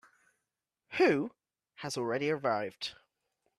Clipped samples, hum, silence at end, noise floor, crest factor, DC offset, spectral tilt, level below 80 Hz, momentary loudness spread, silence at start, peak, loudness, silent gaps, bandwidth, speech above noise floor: under 0.1%; none; 0.65 s; -88 dBFS; 20 dB; under 0.1%; -5 dB/octave; -76 dBFS; 13 LU; 0.9 s; -16 dBFS; -32 LUFS; none; 13 kHz; 57 dB